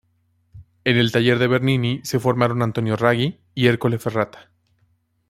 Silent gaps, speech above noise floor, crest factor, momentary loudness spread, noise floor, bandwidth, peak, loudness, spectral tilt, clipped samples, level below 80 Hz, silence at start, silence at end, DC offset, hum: none; 46 dB; 18 dB; 7 LU; -65 dBFS; 15.5 kHz; -2 dBFS; -20 LUFS; -6 dB/octave; under 0.1%; -56 dBFS; 0.55 s; 0.9 s; under 0.1%; none